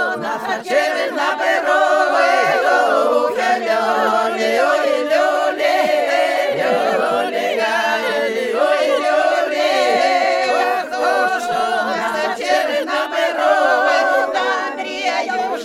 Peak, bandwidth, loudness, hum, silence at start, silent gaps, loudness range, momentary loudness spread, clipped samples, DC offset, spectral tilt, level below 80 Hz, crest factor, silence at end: -2 dBFS; 16 kHz; -16 LUFS; none; 0 s; none; 2 LU; 5 LU; under 0.1%; under 0.1%; -2.5 dB/octave; -64 dBFS; 14 dB; 0 s